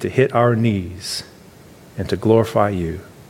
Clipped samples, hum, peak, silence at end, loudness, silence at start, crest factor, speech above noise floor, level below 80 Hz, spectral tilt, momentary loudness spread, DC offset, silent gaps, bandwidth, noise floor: under 0.1%; none; -2 dBFS; 0.1 s; -19 LUFS; 0 s; 18 dB; 26 dB; -46 dBFS; -6.5 dB/octave; 12 LU; under 0.1%; none; 16 kHz; -44 dBFS